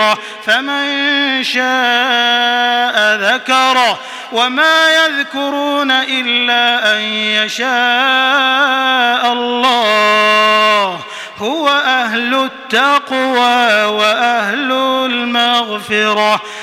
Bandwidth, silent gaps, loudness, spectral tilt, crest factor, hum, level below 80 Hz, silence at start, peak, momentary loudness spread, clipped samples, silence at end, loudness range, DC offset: 17.5 kHz; none; -12 LUFS; -2 dB/octave; 12 dB; none; -66 dBFS; 0 s; 0 dBFS; 6 LU; under 0.1%; 0 s; 2 LU; under 0.1%